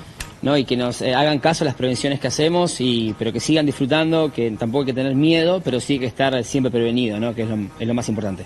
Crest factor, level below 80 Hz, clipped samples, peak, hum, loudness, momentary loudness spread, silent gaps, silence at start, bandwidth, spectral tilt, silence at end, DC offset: 18 dB; -48 dBFS; under 0.1%; -2 dBFS; none; -20 LUFS; 6 LU; none; 0 s; 12.5 kHz; -5 dB/octave; 0 s; under 0.1%